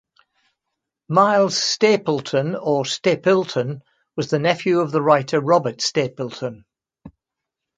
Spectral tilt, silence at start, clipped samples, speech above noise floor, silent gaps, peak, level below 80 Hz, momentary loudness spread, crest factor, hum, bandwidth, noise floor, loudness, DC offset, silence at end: -4.5 dB/octave; 1.1 s; under 0.1%; 65 dB; none; 0 dBFS; -64 dBFS; 12 LU; 20 dB; none; 9.4 kHz; -84 dBFS; -19 LUFS; under 0.1%; 0.7 s